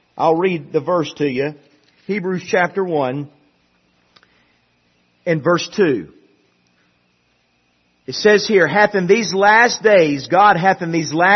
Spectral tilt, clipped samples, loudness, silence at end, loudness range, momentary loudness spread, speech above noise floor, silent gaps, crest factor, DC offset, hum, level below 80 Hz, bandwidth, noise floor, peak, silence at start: -5 dB/octave; under 0.1%; -16 LUFS; 0 s; 10 LU; 12 LU; 47 dB; none; 18 dB; under 0.1%; 60 Hz at -55 dBFS; -62 dBFS; 6.4 kHz; -62 dBFS; 0 dBFS; 0.15 s